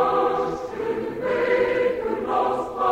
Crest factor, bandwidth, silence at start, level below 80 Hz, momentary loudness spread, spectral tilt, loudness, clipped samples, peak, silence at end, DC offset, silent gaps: 14 dB; 8.8 kHz; 0 s; -52 dBFS; 7 LU; -6 dB/octave; -23 LUFS; under 0.1%; -8 dBFS; 0 s; under 0.1%; none